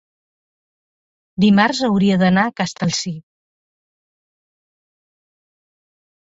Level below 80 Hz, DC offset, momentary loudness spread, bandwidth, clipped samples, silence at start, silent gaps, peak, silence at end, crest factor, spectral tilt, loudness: -56 dBFS; under 0.1%; 14 LU; 7.8 kHz; under 0.1%; 1.4 s; none; 0 dBFS; 3 s; 22 dB; -5.5 dB/octave; -16 LUFS